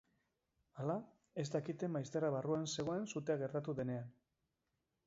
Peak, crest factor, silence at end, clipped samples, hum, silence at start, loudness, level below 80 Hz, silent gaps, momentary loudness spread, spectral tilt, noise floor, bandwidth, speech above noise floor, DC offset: -24 dBFS; 18 dB; 0.95 s; under 0.1%; none; 0.75 s; -41 LUFS; -78 dBFS; none; 7 LU; -6.5 dB/octave; -87 dBFS; 7.6 kHz; 47 dB; under 0.1%